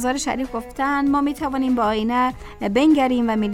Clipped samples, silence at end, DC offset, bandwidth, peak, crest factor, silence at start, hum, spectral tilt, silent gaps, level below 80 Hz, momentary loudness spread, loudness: under 0.1%; 0 s; under 0.1%; 15 kHz; -6 dBFS; 14 dB; 0 s; none; -4.5 dB/octave; none; -42 dBFS; 8 LU; -20 LUFS